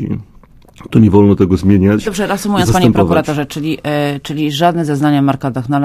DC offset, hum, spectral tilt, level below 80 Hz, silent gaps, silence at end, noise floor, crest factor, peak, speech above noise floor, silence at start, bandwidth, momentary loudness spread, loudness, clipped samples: under 0.1%; none; -6.5 dB/octave; -32 dBFS; none; 0 s; -41 dBFS; 12 dB; 0 dBFS; 29 dB; 0 s; 15.5 kHz; 9 LU; -13 LUFS; 0.1%